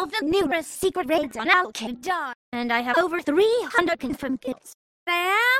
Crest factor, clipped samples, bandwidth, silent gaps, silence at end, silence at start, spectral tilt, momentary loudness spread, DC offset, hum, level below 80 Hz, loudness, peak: 20 dB; under 0.1%; 16 kHz; 2.35-2.52 s, 4.74-5.06 s; 0 s; 0 s; -3 dB/octave; 11 LU; under 0.1%; none; -58 dBFS; -23 LUFS; -4 dBFS